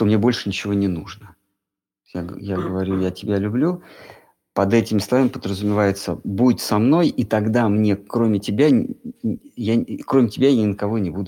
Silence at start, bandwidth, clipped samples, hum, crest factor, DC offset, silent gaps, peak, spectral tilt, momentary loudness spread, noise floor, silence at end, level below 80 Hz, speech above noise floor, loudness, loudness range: 0 s; 17 kHz; under 0.1%; none; 16 dB; under 0.1%; none; -4 dBFS; -7 dB/octave; 11 LU; -84 dBFS; 0 s; -54 dBFS; 65 dB; -20 LUFS; 6 LU